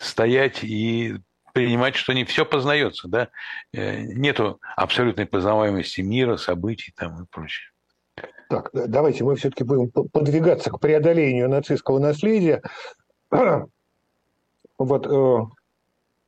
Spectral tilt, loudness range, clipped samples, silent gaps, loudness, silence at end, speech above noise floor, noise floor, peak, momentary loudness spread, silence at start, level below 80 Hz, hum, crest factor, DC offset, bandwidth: -6.5 dB/octave; 5 LU; under 0.1%; none; -21 LUFS; 0.75 s; 51 dB; -72 dBFS; -4 dBFS; 14 LU; 0 s; -58 dBFS; none; 18 dB; under 0.1%; 10 kHz